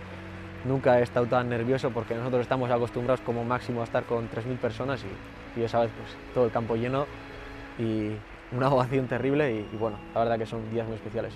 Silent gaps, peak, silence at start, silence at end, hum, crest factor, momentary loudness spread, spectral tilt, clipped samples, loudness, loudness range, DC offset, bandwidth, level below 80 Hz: none; -10 dBFS; 0 s; 0 s; none; 18 dB; 14 LU; -7.5 dB/octave; under 0.1%; -28 LUFS; 3 LU; under 0.1%; 12 kHz; -52 dBFS